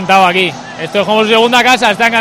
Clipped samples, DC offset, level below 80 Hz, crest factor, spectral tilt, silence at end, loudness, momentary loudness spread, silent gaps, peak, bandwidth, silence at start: 0.7%; under 0.1%; -50 dBFS; 10 dB; -3.5 dB/octave; 0 s; -9 LUFS; 9 LU; none; 0 dBFS; 16 kHz; 0 s